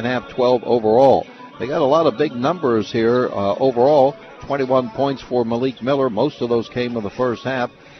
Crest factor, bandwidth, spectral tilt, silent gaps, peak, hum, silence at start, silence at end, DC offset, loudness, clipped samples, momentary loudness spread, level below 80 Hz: 16 dB; 6.4 kHz; -7 dB/octave; none; -2 dBFS; none; 0 s; 0.3 s; under 0.1%; -18 LUFS; under 0.1%; 9 LU; -54 dBFS